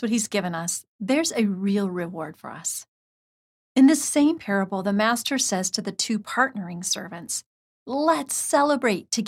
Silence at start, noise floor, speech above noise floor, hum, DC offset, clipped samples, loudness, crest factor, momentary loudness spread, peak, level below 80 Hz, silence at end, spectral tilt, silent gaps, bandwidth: 0 s; under -90 dBFS; over 66 dB; none; under 0.1%; under 0.1%; -24 LUFS; 18 dB; 11 LU; -6 dBFS; -70 dBFS; 0 s; -3.5 dB/octave; 0.88-0.99 s, 2.88-3.75 s, 7.46-7.86 s; 16.5 kHz